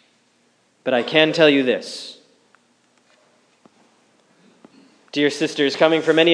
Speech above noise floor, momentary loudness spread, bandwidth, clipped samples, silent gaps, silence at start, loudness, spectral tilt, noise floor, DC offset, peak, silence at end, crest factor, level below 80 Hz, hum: 44 dB; 16 LU; 10.5 kHz; under 0.1%; none; 0.85 s; -18 LUFS; -4.5 dB/octave; -61 dBFS; under 0.1%; 0 dBFS; 0 s; 20 dB; -82 dBFS; none